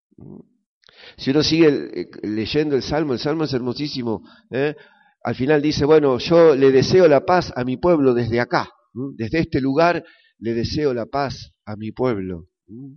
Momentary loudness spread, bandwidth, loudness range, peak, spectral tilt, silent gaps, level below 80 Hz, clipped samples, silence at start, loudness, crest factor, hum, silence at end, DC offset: 17 LU; 6.6 kHz; 7 LU; -2 dBFS; -5 dB/octave; 0.66-0.81 s; -48 dBFS; under 0.1%; 0.25 s; -19 LUFS; 18 dB; none; 0.05 s; under 0.1%